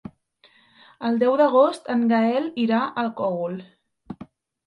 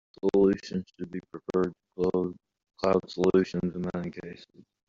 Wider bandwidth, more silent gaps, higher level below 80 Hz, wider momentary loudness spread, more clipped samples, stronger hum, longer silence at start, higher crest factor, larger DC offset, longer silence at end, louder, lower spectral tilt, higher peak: first, 10.5 kHz vs 7.6 kHz; neither; second, -68 dBFS vs -60 dBFS; first, 22 LU vs 15 LU; neither; neither; second, 0.05 s vs 0.25 s; about the same, 18 dB vs 18 dB; neither; about the same, 0.4 s vs 0.45 s; first, -22 LUFS vs -29 LUFS; about the same, -7 dB/octave vs -7 dB/octave; first, -6 dBFS vs -10 dBFS